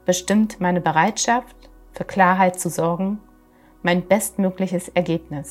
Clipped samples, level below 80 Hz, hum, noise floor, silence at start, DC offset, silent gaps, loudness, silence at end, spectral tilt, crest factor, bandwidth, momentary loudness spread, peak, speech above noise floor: under 0.1%; -52 dBFS; none; -52 dBFS; 0.05 s; under 0.1%; none; -20 LUFS; 0 s; -5 dB/octave; 20 dB; 15.5 kHz; 8 LU; 0 dBFS; 32 dB